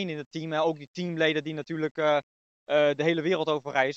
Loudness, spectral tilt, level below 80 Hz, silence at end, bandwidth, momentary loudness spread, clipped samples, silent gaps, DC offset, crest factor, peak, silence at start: -27 LUFS; -6 dB/octave; -84 dBFS; 0 s; 7.6 kHz; 10 LU; under 0.1%; 0.26-0.31 s, 0.87-0.94 s, 1.91-1.95 s, 2.23-2.66 s; under 0.1%; 20 dB; -8 dBFS; 0 s